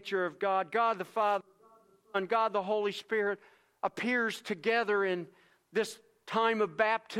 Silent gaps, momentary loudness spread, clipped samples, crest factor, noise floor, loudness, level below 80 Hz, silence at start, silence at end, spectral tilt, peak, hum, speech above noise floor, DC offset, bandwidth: none; 9 LU; under 0.1%; 20 dB; -63 dBFS; -32 LUFS; -84 dBFS; 0 s; 0 s; -4.5 dB/octave; -12 dBFS; none; 31 dB; under 0.1%; 14.5 kHz